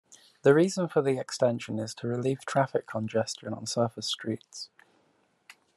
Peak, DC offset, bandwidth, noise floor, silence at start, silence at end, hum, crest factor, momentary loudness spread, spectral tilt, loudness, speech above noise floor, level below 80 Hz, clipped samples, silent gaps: -10 dBFS; under 0.1%; 12.5 kHz; -69 dBFS; 0.1 s; 1.1 s; none; 20 dB; 12 LU; -5 dB/octave; -29 LUFS; 41 dB; -74 dBFS; under 0.1%; none